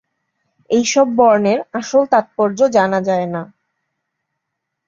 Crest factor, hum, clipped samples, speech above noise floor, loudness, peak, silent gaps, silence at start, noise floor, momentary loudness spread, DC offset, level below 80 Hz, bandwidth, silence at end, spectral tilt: 16 dB; none; under 0.1%; 63 dB; -15 LUFS; -2 dBFS; none; 0.7 s; -77 dBFS; 8 LU; under 0.1%; -62 dBFS; 7.8 kHz; 1.45 s; -4.5 dB/octave